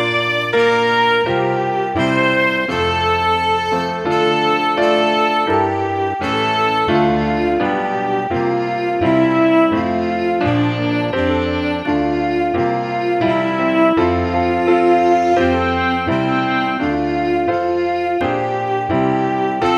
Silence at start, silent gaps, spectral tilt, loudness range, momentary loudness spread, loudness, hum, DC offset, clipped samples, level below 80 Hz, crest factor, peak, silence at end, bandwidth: 0 s; none; -6.5 dB/octave; 3 LU; 5 LU; -16 LUFS; none; under 0.1%; under 0.1%; -42 dBFS; 14 dB; -2 dBFS; 0 s; 10.5 kHz